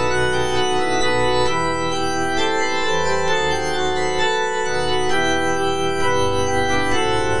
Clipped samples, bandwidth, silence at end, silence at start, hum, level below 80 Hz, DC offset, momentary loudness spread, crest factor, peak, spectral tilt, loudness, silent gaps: under 0.1%; 10.5 kHz; 0 s; 0 s; none; -40 dBFS; 7%; 2 LU; 12 dB; -6 dBFS; -3.5 dB/octave; -20 LUFS; none